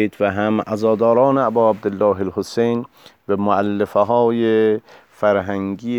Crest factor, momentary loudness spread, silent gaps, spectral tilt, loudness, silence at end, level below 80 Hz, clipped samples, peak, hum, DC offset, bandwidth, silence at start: 14 dB; 8 LU; none; -7.5 dB/octave; -18 LUFS; 0 s; -60 dBFS; under 0.1%; -2 dBFS; none; under 0.1%; 13 kHz; 0 s